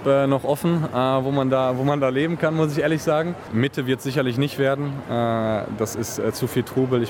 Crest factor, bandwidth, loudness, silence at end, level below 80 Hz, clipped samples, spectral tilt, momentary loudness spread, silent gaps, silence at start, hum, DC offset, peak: 16 dB; 18 kHz; -22 LUFS; 0 s; -56 dBFS; under 0.1%; -6.5 dB/octave; 5 LU; none; 0 s; none; under 0.1%; -6 dBFS